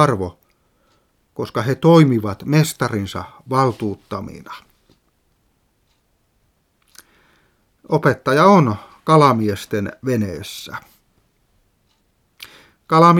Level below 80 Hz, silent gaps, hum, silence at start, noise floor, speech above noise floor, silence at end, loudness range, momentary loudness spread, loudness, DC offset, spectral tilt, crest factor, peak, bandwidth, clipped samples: -56 dBFS; none; none; 0 s; -64 dBFS; 47 dB; 0 s; 11 LU; 23 LU; -17 LUFS; under 0.1%; -6.5 dB/octave; 20 dB; 0 dBFS; 16 kHz; under 0.1%